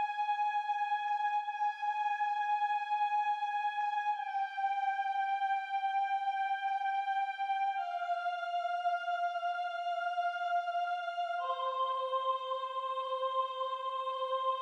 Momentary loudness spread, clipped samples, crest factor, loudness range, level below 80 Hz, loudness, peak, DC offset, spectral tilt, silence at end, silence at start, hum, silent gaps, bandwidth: 3 LU; under 0.1%; 12 dB; 2 LU; under -90 dBFS; -34 LUFS; -22 dBFS; under 0.1%; 3 dB/octave; 0 s; 0 s; none; none; 8 kHz